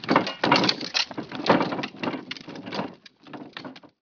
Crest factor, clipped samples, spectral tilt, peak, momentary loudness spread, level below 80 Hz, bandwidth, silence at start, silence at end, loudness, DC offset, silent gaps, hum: 24 dB; under 0.1%; -4 dB/octave; -2 dBFS; 20 LU; -68 dBFS; 5.4 kHz; 0 s; 0.15 s; -25 LUFS; under 0.1%; none; none